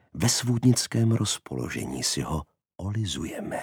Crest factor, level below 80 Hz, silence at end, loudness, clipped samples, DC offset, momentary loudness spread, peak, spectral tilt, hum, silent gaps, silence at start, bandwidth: 18 dB; -48 dBFS; 0 s; -26 LUFS; under 0.1%; under 0.1%; 10 LU; -8 dBFS; -4.5 dB/octave; none; none; 0.15 s; 18 kHz